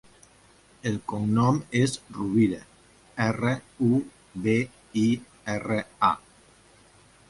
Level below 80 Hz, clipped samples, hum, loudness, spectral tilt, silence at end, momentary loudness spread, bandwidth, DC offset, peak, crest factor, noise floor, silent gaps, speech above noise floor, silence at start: -58 dBFS; under 0.1%; none; -26 LUFS; -6.5 dB/octave; 1.1 s; 9 LU; 11.5 kHz; under 0.1%; -8 dBFS; 20 dB; -57 dBFS; none; 32 dB; 0.85 s